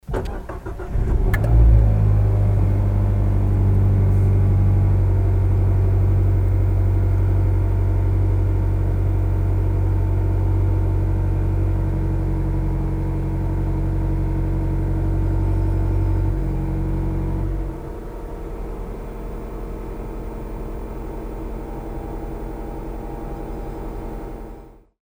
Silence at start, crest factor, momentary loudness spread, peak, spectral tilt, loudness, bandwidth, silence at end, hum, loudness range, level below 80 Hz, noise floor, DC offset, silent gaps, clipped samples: 0.1 s; 16 dB; 15 LU; -4 dBFS; -10 dB/octave; -21 LUFS; 3.4 kHz; 0.35 s; none; 14 LU; -22 dBFS; -41 dBFS; under 0.1%; none; under 0.1%